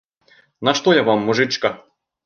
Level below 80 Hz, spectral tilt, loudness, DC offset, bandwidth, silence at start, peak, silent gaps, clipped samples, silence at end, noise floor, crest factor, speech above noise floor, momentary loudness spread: -62 dBFS; -4.5 dB/octave; -18 LUFS; under 0.1%; 7.2 kHz; 0.6 s; -2 dBFS; none; under 0.1%; 0.5 s; -56 dBFS; 18 dB; 38 dB; 8 LU